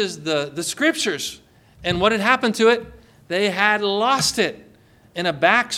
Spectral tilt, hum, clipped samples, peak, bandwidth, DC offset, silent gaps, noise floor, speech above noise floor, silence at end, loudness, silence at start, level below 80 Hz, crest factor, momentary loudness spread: -3 dB/octave; none; under 0.1%; -2 dBFS; 16.5 kHz; under 0.1%; none; -52 dBFS; 32 dB; 0 s; -20 LUFS; 0 s; -52 dBFS; 20 dB; 9 LU